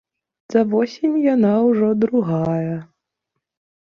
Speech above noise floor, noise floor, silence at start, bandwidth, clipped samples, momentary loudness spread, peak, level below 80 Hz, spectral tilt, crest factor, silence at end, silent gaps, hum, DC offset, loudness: 62 dB; -79 dBFS; 0.5 s; 6.8 kHz; under 0.1%; 7 LU; -4 dBFS; -60 dBFS; -9 dB/octave; 16 dB; 1.05 s; none; none; under 0.1%; -18 LUFS